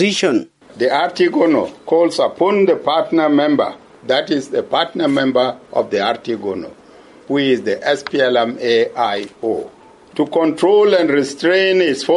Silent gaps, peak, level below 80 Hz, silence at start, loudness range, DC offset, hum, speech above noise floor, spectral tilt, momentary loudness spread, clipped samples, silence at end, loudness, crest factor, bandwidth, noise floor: none; -2 dBFS; -62 dBFS; 0 s; 3 LU; under 0.1%; none; 27 dB; -4.5 dB/octave; 9 LU; under 0.1%; 0 s; -16 LUFS; 14 dB; 11.5 kHz; -43 dBFS